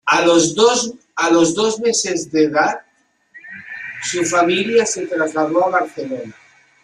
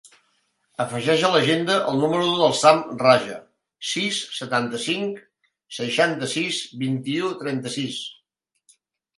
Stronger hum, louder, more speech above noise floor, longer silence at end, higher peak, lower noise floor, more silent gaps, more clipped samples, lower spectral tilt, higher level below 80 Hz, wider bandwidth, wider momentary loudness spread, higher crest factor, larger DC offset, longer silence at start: neither; first, -16 LUFS vs -22 LUFS; second, 43 dB vs 51 dB; second, 0.5 s vs 1.05 s; about the same, -2 dBFS vs 0 dBFS; second, -60 dBFS vs -73 dBFS; neither; neither; about the same, -3 dB/octave vs -4 dB/octave; first, -60 dBFS vs -68 dBFS; about the same, 12 kHz vs 11.5 kHz; about the same, 16 LU vs 14 LU; second, 16 dB vs 22 dB; neither; about the same, 0.05 s vs 0.05 s